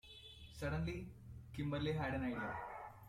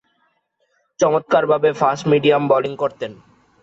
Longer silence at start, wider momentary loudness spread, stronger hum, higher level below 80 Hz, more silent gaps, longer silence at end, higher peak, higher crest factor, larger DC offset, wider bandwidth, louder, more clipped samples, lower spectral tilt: second, 0.05 s vs 1 s; first, 15 LU vs 9 LU; neither; about the same, -58 dBFS vs -62 dBFS; neither; second, 0 s vs 0.5 s; second, -28 dBFS vs -4 dBFS; about the same, 16 dB vs 16 dB; neither; first, 15.5 kHz vs 7.8 kHz; second, -43 LUFS vs -17 LUFS; neither; first, -7 dB/octave vs -5.5 dB/octave